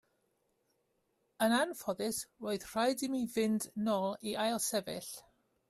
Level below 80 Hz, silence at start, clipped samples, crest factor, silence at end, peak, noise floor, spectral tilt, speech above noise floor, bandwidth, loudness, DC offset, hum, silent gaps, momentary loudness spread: -74 dBFS; 1.4 s; under 0.1%; 18 dB; 0.5 s; -18 dBFS; -79 dBFS; -3.5 dB/octave; 44 dB; 15.5 kHz; -35 LUFS; under 0.1%; none; none; 8 LU